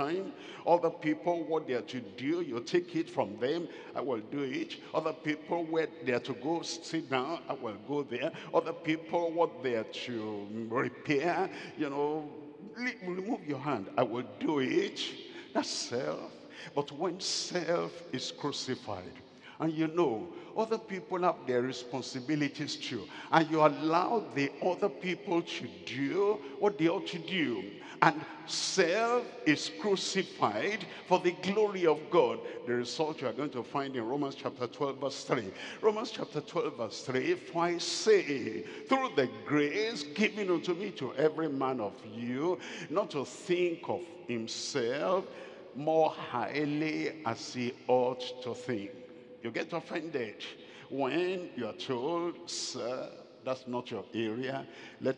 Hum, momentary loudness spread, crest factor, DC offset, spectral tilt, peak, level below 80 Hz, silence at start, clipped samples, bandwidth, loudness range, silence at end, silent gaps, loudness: none; 10 LU; 28 dB; under 0.1%; -4.5 dB/octave; -6 dBFS; -86 dBFS; 0 s; under 0.1%; 10.5 kHz; 5 LU; 0 s; none; -33 LUFS